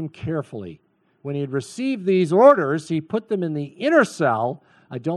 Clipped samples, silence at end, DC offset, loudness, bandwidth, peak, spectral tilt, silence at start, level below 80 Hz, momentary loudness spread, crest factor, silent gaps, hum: under 0.1%; 0 s; under 0.1%; -21 LUFS; 12 kHz; -2 dBFS; -6.5 dB/octave; 0 s; -62 dBFS; 21 LU; 18 dB; none; none